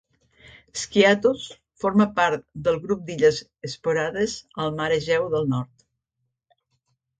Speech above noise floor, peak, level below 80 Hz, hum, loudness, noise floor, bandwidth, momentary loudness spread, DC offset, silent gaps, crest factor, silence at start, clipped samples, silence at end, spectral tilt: 56 dB; -4 dBFS; -56 dBFS; none; -23 LUFS; -79 dBFS; 9.4 kHz; 13 LU; under 0.1%; none; 20 dB; 0.75 s; under 0.1%; 1.55 s; -5 dB/octave